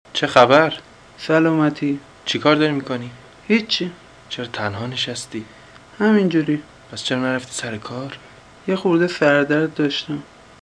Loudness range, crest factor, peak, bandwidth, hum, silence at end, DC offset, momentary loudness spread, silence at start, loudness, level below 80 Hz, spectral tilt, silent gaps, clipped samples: 4 LU; 20 dB; 0 dBFS; 11 kHz; none; 0.35 s; under 0.1%; 16 LU; 0.15 s; -19 LUFS; -58 dBFS; -5 dB/octave; none; under 0.1%